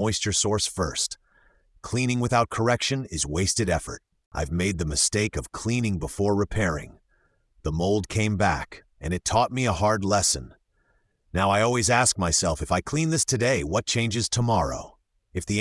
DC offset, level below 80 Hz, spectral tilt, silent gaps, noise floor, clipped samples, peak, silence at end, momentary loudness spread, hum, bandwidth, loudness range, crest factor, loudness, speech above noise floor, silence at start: under 0.1%; -44 dBFS; -4 dB/octave; 4.26-4.31 s; -67 dBFS; under 0.1%; -6 dBFS; 0 s; 10 LU; none; 12 kHz; 4 LU; 18 dB; -24 LUFS; 43 dB; 0 s